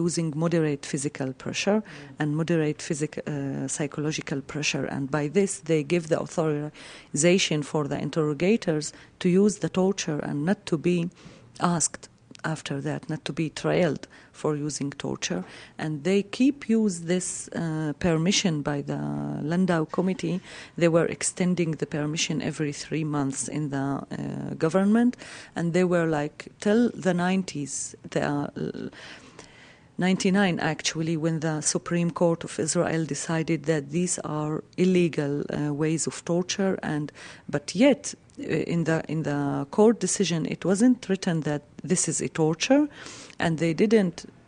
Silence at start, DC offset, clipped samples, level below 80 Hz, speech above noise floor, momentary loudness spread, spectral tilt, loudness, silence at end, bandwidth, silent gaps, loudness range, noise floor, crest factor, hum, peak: 0 s; under 0.1%; under 0.1%; -60 dBFS; 26 dB; 10 LU; -5 dB/octave; -26 LUFS; 0.2 s; 10.5 kHz; none; 4 LU; -52 dBFS; 20 dB; none; -6 dBFS